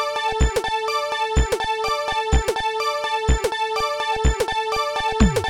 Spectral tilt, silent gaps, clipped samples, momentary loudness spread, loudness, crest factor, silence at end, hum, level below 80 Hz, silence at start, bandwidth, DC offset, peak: -4.5 dB/octave; none; under 0.1%; 2 LU; -22 LUFS; 16 dB; 0 s; none; -26 dBFS; 0 s; 17 kHz; 0.4%; -4 dBFS